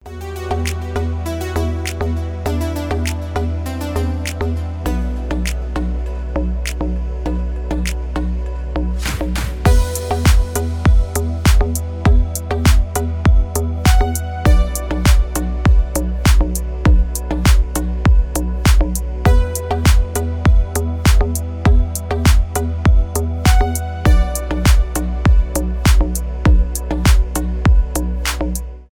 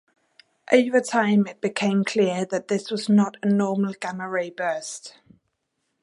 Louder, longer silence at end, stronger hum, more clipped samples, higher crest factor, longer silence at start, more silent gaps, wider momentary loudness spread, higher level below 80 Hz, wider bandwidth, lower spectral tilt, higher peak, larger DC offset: first, -18 LUFS vs -23 LUFS; second, 0.1 s vs 0.95 s; neither; neither; second, 14 dB vs 20 dB; second, 0.05 s vs 0.7 s; neither; about the same, 7 LU vs 9 LU; first, -16 dBFS vs -74 dBFS; first, 18.5 kHz vs 11.5 kHz; about the same, -5.5 dB/octave vs -5.5 dB/octave; first, 0 dBFS vs -4 dBFS; neither